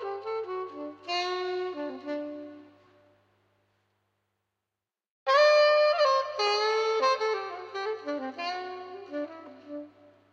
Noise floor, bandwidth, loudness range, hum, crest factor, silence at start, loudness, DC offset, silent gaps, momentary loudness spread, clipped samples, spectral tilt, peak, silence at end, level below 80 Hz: -89 dBFS; 7.8 kHz; 15 LU; none; 18 dB; 0 s; -27 LUFS; under 0.1%; 5.10-5.26 s; 20 LU; under 0.1%; -2 dB/octave; -10 dBFS; 0.45 s; -88 dBFS